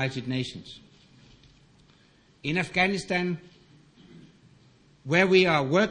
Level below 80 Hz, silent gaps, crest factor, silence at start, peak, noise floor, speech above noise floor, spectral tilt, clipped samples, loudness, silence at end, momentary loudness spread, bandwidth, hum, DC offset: -60 dBFS; none; 22 dB; 0 s; -6 dBFS; -60 dBFS; 35 dB; -5.5 dB/octave; under 0.1%; -25 LUFS; 0 s; 23 LU; 10.5 kHz; none; under 0.1%